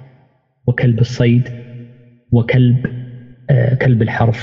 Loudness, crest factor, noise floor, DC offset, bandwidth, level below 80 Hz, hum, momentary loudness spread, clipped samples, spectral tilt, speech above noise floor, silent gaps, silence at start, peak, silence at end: -15 LUFS; 14 dB; -54 dBFS; under 0.1%; 7 kHz; -42 dBFS; none; 19 LU; under 0.1%; -8.5 dB/octave; 41 dB; none; 0 s; -2 dBFS; 0 s